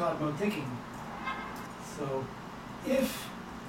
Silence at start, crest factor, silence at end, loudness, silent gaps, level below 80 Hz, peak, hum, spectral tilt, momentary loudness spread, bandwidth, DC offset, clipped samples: 0 s; 18 dB; 0 s; -36 LUFS; none; -58 dBFS; -18 dBFS; none; -5.5 dB/octave; 11 LU; 17 kHz; under 0.1%; under 0.1%